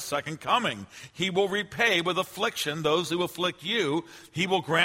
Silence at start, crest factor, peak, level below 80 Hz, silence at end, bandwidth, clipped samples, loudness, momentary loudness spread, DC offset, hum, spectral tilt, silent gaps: 0 s; 20 dB; -8 dBFS; -66 dBFS; 0 s; 16 kHz; under 0.1%; -27 LUFS; 8 LU; under 0.1%; none; -3.5 dB/octave; none